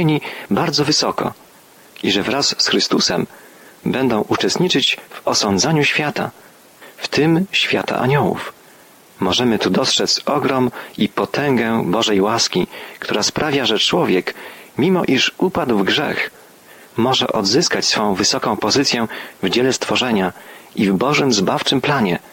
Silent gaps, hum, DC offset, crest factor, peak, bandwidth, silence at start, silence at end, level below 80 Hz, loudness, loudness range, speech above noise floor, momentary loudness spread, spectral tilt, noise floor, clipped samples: none; none; under 0.1%; 14 dB; -4 dBFS; 17 kHz; 0 s; 0.05 s; -54 dBFS; -17 LUFS; 2 LU; 29 dB; 9 LU; -3.5 dB/octave; -46 dBFS; under 0.1%